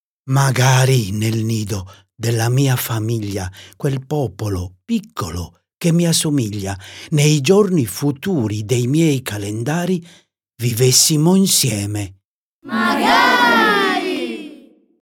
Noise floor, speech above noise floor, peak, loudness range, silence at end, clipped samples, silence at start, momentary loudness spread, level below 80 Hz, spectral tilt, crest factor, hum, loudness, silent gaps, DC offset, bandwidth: -44 dBFS; 27 dB; 0 dBFS; 6 LU; 0.45 s; under 0.1%; 0.25 s; 14 LU; -50 dBFS; -4.5 dB/octave; 16 dB; none; -17 LUFS; 12.25-12.62 s; under 0.1%; 17.5 kHz